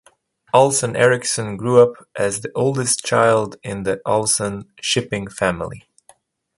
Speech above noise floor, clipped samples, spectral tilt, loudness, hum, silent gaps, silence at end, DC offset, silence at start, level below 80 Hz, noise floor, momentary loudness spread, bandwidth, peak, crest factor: 38 dB; under 0.1%; -3.5 dB/octave; -18 LUFS; none; none; 0.8 s; under 0.1%; 0.55 s; -52 dBFS; -56 dBFS; 11 LU; 11.5 kHz; 0 dBFS; 18 dB